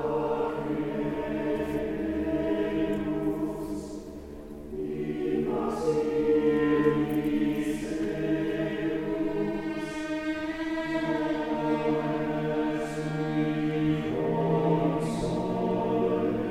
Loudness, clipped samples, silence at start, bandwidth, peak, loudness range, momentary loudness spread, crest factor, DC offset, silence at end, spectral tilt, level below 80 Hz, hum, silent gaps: -29 LUFS; under 0.1%; 0 s; 14 kHz; -12 dBFS; 4 LU; 7 LU; 16 dB; under 0.1%; 0 s; -7.5 dB/octave; -50 dBFS; none; none